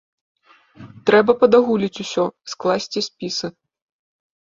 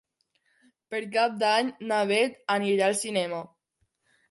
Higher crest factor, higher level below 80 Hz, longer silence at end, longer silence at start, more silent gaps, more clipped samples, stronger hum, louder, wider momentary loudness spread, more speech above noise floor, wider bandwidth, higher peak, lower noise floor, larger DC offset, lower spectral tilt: about the same, 20 dB vs 18 dB; first, -60 dBFS vs -80 dBFS; first, 1.1 s vs 0.85 s; about the same, 0.8 s vs 0.9 s; neither; neither; neither; first, -19 LUFS vs -26 LUFS; about the same, 11 LU vs 10 LU; second, 27 dB vs 49 dB; second, 7.6 kHz vs 12 kHz; first, 0 dBFS vs -10 dBFS; second, -45 dBFS vs -75 dBFS; neither; about the same, -4.5 dB/octave vs -3.5 dB/octave